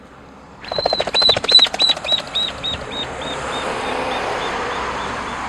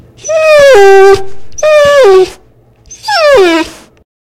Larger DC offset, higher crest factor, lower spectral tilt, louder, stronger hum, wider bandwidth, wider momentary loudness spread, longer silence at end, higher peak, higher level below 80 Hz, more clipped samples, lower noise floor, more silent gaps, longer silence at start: neither; first, 20 dB vs 6 dB; about the same, -2 dB/octave vs -3 dB/octave; second, -17 LUFS vs -5 LUFS; neither; second, 13.5 kHz vs 15 kHz; first, 15 LU vs 12 LU; second, 0 s vs 0.6 s; about the same, 0 dBFS vs 0 dBFS; about the same, -44 dBFS vs -40 dBFS; second, under 0.1% vs 8%; about the same, -41 dBFS vs -43 dBFS; neither; second, 0 s vs 0.25 s